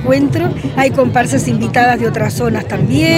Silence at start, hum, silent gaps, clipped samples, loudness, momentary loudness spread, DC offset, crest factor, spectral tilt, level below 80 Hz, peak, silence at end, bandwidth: 0 s; none; none; under 0.1%; -13 LUFS; 5 LU; under 0.1%; 12 dB; -6 dB/octave; -38 dBFS; 0 dBFS; 0 s; 16 kHz